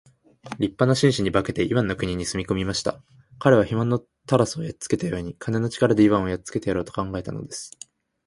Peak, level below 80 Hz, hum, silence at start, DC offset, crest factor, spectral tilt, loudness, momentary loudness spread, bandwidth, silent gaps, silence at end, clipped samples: -2 dBFS; -48 dBFS; none; 0.45 s; under 0.1%; 22 dB; -6 dB/octave; -23 LUFS; 13 LU; 11.5 kHz; none; 0.6 s; under 0.1%